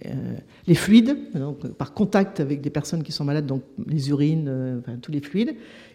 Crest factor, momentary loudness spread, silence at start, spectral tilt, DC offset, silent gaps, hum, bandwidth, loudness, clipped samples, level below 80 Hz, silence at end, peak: 20 dB; 15 LU; 0.05 s; -7 dB/octave; under 0.1%; none; none; 15.5 kHz; -23 LUFS; under 0.1%; -56 dBFS; 0.1 s; -4 dBFS